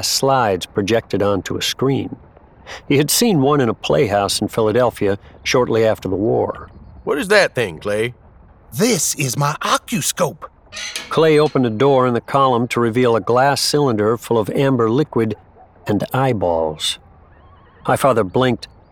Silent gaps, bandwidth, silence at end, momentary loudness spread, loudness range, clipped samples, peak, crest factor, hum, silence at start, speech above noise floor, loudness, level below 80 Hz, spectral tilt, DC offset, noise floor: none; 19 kHz; 0.25 s; 11 LU; 4 LU; under 0.1%; -2 dBFS; 16 dB; none; 0 s; 29 dB; -17 LUFS; -48 dBFS; -4.5 dB/octave; under 0.1%; -46 dBFS